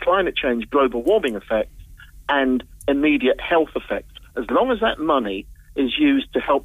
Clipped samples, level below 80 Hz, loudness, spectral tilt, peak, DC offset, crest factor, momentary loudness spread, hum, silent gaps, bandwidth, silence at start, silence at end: under 0.1%; -44 dBFS; -20 LUFS; -5.5 dB/octave; -8 dBFS; under 0.1%; 14 dB; 11 LU; none; none; 15 kHz; 0 s; 0 s